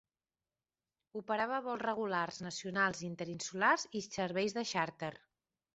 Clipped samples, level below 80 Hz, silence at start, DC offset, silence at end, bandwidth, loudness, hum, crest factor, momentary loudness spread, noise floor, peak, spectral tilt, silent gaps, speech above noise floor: under 0.1%; -76 dBFS; 1.15 s; under 0.1%; 0.6 s; 8 kHz; -36 LUFS; none; 22 dB; 11 LU; under -90 dBFS; -16 dBFS; -2.5 dB/octave; none; over 53 dB